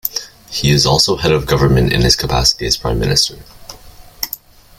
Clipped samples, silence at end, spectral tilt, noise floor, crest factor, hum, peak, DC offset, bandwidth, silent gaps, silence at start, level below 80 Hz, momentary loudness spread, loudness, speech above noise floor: under 0.1%; 0.45 s; -4 dB/octave; -38 dBFS; 16 dB; none; 0 dBFS; under 0.1%; 16.5 kHz; none; 0.05 s; -28 dBFS; 13 LU; -14 LUFS; 25 dB